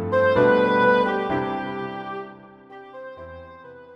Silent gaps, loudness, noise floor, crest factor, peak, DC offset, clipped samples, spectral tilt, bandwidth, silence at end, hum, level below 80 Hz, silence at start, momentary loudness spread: none; -21 LUFS; -44 dBFS; 16 dB; -6 dBFS; under 0.1%; under 0.1%; -7.5 dB/octave; 6.2 kHz; 0 s; none; -56 dBFS; 0 s; 23 LU